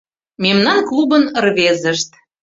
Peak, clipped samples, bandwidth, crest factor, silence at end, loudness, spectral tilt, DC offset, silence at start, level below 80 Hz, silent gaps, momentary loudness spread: -2 dBFS; under 0.1%; 7.8 kHz; 14 dB; 0.35 s; -14 LUFS; -4 dB/octave; under 0.1%; 0.4 s; -58 dBFS; none; 6 LU